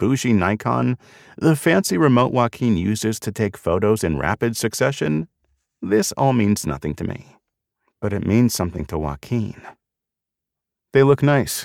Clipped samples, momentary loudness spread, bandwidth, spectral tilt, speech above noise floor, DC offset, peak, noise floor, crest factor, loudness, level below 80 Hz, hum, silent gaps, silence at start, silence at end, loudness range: under 0.1%; 11 LU; 17 kHz; -6 dB/octave; 66 dB; under 0.1%; -4 dBFS; -85 dBFS; 16 dB; -20 LUFS; -44 dBFS; none; none; 0 s; 0 s; 5 LU